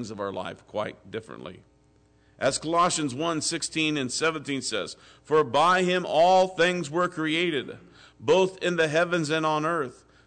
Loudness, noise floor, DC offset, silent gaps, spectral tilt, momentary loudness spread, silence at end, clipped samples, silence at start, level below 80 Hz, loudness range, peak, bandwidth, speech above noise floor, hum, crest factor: -25 LUFS; -61 dBFS; under 0.1%; none; -4 dB/octave; 15 LU; 0.35 s; under 0.1%; 0 s; -64 dBFS; 5 LU; -12 dBFS; 9.4 kHz; 36 dB; none; 14 dB